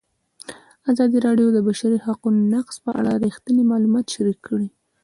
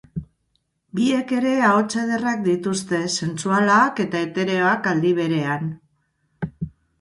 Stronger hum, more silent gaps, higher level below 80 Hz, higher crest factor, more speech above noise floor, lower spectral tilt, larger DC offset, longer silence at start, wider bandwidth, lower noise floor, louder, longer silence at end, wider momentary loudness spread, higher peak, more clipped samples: neither; neither; second, -62 dBFS vs -54 dBFS; about the same, 14 dB vs 18 dB; second, 24 dB vs 50 dB; first, -6.5 dB/octave vs -5 dB/octave; neither; first, 0.5 s vs 0.15 s; about the same, 11.5 kHz vs 11.5 kHz; second, -43 dBFS vs -70 dBFS; about the same, -20 LUFS vs -21 LUFS; about the same, 0.35 s vs 0.3 s; second, 13 LU vs 16 LU; about the same, -6 dBFS vs -4 dBFS; neither